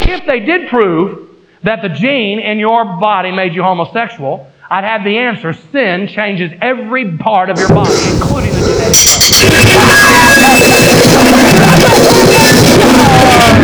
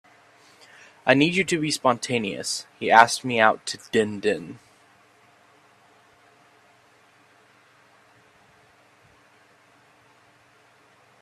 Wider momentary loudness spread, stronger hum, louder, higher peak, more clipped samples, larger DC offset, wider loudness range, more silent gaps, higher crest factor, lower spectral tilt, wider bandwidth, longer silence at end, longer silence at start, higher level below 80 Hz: about the same, 12 LU vs 13 LU; neither; first, -7 LUFS vs -22 LUFS; about the same, 0 dBFS vs 0 dBFS; neither; neither; about the same, 10 LU vs 10 LU; neither; second, 8 dB vs 26 dB; about the same, -3.5 dB/octave vs -3.5 dB/octave; first, over 20 kHz vs 14.5 kHz; second, 0 s vs 6.65 s; second, 0 s vs 1.05 s; first, -26 dBFS vs -70 dBFS